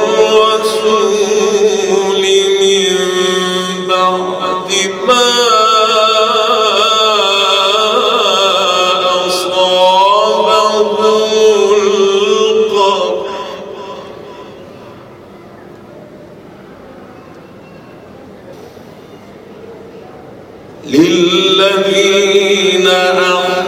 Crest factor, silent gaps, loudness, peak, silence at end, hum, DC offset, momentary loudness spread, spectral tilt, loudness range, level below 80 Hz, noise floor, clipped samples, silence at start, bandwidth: 12 dB; none; -10 LUFS; 0 dBFS; 0 s; none; under 0.1%; 7 LU; -2.5 dB/octave; 8 LU; -56 dBFS; -34 dBFS; under 0.1%; 0 s; 16 kHz